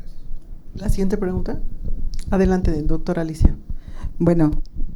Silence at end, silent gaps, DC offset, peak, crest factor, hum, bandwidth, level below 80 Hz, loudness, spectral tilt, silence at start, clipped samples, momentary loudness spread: 0 s; none; under 0.1%; 0 dBFS; 18 dB; none; 11.5 kHz; -22 dBFS; -22 LUFS; -8.5 dB/octave; 0 s; under 0.1%; 20 LU